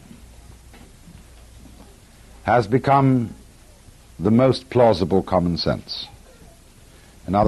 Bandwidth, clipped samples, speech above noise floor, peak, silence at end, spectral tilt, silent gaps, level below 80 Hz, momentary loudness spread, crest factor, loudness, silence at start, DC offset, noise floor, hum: 12.5 kHz; under 0.1%; 30 dB; -4 dBFS; 0 s; -7.5 dB/octave; none; -46 dBFS; 14 LU; 18 dB; -20 LUFS; 1.55 s; under 0.1%; -48 dBFS; none